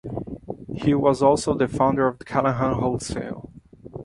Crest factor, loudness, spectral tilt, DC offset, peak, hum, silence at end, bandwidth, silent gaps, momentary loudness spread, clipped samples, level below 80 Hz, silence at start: 18 dB; -22 LUFS; -6.5 dB/octave; under 0.1%; -4 dBFS; none; 0 s; 11.5 kHz; none; 16 LU; under 0.1%; -46 dBFS; 0.05 s